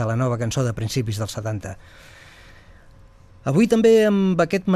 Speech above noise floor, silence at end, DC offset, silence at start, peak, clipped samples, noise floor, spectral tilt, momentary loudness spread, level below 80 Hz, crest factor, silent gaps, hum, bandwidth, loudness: 28 dB; 0 s; under 0.1%; 0 s; -6 dBFS; under 0.1%; -48 dBFS; -6.5 dB/octave; 16 LU; -50 dBFS; 16 dB; none; none; 14.5 kHz; -20 LUFS